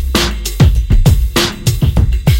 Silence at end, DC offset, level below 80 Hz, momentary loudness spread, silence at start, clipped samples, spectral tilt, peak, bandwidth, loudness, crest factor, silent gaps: 0 s; under 0.1%; -14 dBFS; 3 LU; 0 s; under 0.1%; -5 dB/octave; 0 dBFS; 17 kHz; -13 LUFS; 10 dB; none